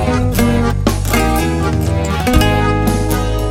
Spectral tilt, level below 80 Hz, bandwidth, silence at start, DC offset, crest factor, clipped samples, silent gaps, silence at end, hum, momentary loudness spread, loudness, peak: -5.5 dB/octave; -20 dBFS; 17 kHz; 0 s; under 0.1%; 14 dB; under 0.1%; none; 0 s; none; 4 LU; -15 LUFS; 0 dBFS